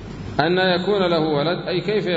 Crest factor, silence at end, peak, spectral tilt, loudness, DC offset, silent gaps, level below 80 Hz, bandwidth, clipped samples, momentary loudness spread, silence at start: 18 dB; 0 s; -2 dBFS; -7 dB/octave; -20 LUFS; under 0.1%; none; -46 dBFS; 7.8 kHz; under 0.1%; 4 LU; 0 s